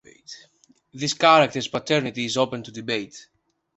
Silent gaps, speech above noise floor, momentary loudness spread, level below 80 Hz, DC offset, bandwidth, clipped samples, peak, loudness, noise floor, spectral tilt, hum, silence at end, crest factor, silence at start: none; 38 dB; 26 LU; -64 dBFS; under 0.1%; 8.2 kHz; under 0.1%; -2 dBFS; -22 LUFS; -60 dBFS; -4 dB/octave; none; 0.55 s; 22 dB; 0.3 s